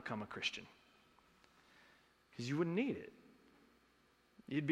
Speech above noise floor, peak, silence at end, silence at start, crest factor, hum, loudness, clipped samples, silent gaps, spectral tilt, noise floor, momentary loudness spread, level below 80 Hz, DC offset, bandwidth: 32 dB; -22 dBFS; 0 s; 0 s; 22 dB; none; -41 LUFS; under 0.1%; none; -5.5 dB/octave; -73 dBFS; 20 LU; -80 dBFS; under 0.1%; 13 kHz